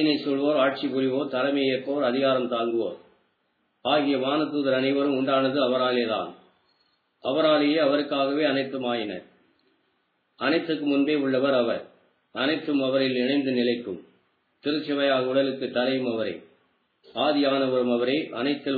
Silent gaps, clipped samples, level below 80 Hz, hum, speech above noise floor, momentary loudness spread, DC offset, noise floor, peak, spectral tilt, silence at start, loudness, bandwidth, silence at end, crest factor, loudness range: none; under 0.1%; -80 dBFS; none; 48 dB; 8 LU; under 0.1%; -72 dBFS; -10 dBFS; -8 dB/octave; 0 s; -25 LUFS; 4.9 kHz; 0 s; 16 dB; 2 LU